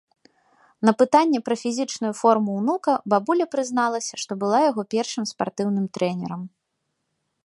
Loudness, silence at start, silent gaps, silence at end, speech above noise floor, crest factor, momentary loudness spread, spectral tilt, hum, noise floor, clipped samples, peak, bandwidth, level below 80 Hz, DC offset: -22 LUFS; 0.8 s; none; 1 s; 55 dB; 20 dB; 9 LU; -5 dB/octave; none; -77 dBFS; under 0.1%; -2 dBFS; 11.5 kHz; -72 dBFS; under 0.1%